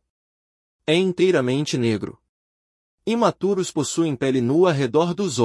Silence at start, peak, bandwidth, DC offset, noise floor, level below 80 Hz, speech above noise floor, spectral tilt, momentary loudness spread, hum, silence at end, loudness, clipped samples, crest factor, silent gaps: 0.9 s; -6 dBFS; 12 kHz; under 0.1%; under -90 dBFS; -64 dBFS; over 70 dB; -5.5 dB/octave; 8 LU; none; 0 s; -21 LUFS; under 0.1%; 16 dB; 2.29-2.98 s